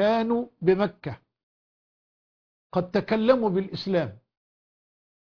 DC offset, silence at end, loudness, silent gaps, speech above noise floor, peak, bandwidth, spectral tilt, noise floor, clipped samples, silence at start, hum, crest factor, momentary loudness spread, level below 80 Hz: under 0.1%; 1.15 s; -25 LUFS; 1.43-2.70 s; over 66 dB; -8 dBFS; 5.4 kHz; -8 dB/octave; under -90 dBFS; under 0.1%; 0 s; none; 20 dB; 14 LU; -62 dBFS